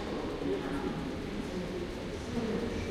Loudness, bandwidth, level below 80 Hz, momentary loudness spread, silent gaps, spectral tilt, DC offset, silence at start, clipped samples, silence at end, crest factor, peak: -36 LUFS; 15 kHz; -46 dBFS; 4 LU; none; -6 dB/octave; under 0.1%; 0 s; under 0.1%; 0 s; 14 dB; -22 dBFS